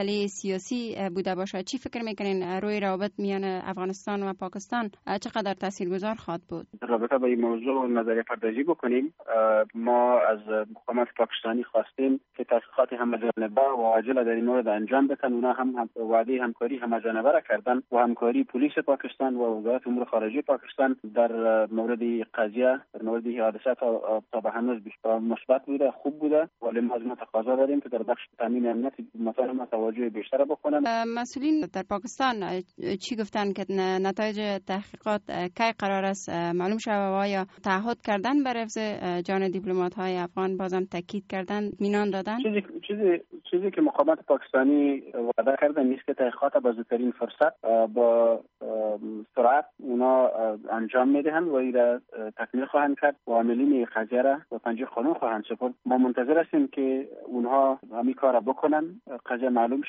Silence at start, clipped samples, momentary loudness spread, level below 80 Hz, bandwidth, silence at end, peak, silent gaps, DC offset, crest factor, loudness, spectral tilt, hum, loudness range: 0 s; under 0.1%; 8 LU; -72 dBFS; 8 kHz; 0 s; -8 dBFS; none; under 0.1%; 18 dB; -27 LUFS; -4.5 dB/octave; none; 4 LU